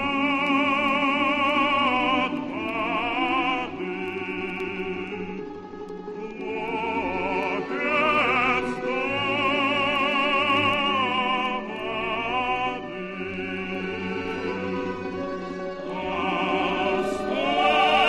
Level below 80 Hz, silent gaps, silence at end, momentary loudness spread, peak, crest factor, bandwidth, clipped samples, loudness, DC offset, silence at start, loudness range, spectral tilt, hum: -52 dBFS; none; 0 s; 11 LU; -8 dBFS; 18 dB; 12.5 kHz; under 0.1%; -24 LUFS; under 0.1%; 0 s; 8 LU; -5 dB/octave; none